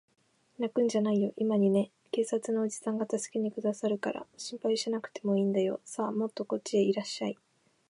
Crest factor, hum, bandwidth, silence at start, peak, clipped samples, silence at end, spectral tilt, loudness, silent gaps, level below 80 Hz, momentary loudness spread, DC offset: 14 dB; none; 11.5 kHz; 0.6 s; -16 dBFS; under 0.1%; 0.55 s; -5.5 dB/octave; -31 LUFS; none; -82 dBFS; 8 LU; under 0.1%